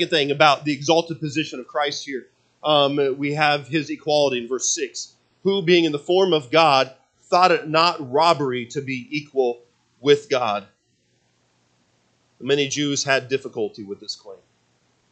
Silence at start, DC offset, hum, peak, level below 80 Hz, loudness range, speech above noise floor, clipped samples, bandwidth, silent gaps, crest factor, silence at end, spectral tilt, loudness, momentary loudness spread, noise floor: 0 s; under 0.1%; none; 0 dBFS; -72 dBFS; 6 LU; 45 dB; under 0.1%; 9 kHz; none; 22 dB; 0.75 s; -3.5 dB/octave; -20 LUFS; 13 LU; -66 dBFS